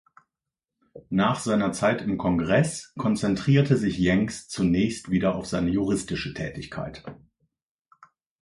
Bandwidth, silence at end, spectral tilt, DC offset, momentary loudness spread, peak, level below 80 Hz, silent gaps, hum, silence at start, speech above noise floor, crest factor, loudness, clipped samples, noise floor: 11.5 kHz; 1.25 s; -6 dB/octave; under 0.1%; 12 LU; -6 dBFS; -48 dBFS; none; none; 0.95 s; 63 dB; 18 dB; -25 LUFS; under 0.1%; -88 dBFS